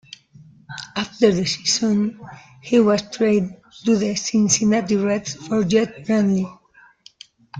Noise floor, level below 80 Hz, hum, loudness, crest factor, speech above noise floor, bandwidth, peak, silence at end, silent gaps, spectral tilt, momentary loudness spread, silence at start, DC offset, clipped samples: -50 dBFS; -58 dBFS; none; -20 LUFS; 18 dB; 31 dB; 9.4 kHz; -2 dBFS; 0 s; none; -4.5 dB/octave; 13 LU; 0.7 s; under 0.1%; under 0.1%